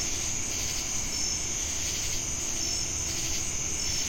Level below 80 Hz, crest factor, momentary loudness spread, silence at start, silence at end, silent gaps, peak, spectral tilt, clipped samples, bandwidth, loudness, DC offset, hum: -42 dBFS; 14 dB; 1 LU; 0 s; 0 s; none; -16 dBFS; -1 dB/octave; under 0.1%; 16.5 kHz; -28 LUFS; under 0.1%; none